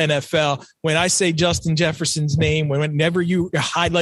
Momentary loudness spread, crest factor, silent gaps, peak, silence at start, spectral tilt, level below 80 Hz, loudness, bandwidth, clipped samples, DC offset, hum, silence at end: 4 LU; 16 dB; none; -4 dBFS; 0 s; -4.5 dB/octave; -44 dBFS; -19 LUFS; 12.5 kHz; under 0.1%; under 0.1%; none; 0 s